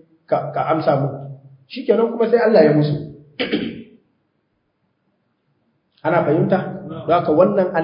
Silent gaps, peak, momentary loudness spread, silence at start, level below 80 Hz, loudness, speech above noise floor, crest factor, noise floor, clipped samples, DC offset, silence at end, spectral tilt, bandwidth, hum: none; 0 dBFS; 16 LU; 0.3 s; -58 dBFS; -18 LUFS; 52 dB; 18 dB; -68 dBFS; under 0.1%; under 0.1%; 0 s; -12 dB/octave; 5.4 kHz; none